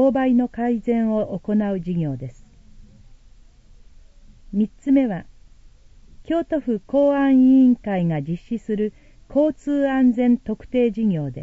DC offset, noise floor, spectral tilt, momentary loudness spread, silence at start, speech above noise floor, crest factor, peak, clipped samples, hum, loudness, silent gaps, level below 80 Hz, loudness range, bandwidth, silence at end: under 0.1%; -48 dBFS; -9 dB/octave; 11 LU; 0 s; 29 dB; 14 dB; -8 dBFS; under 0.1%; none; -20 LUFS; none; -48 dBFS; 8 LU; 7.4 kHz; 0 s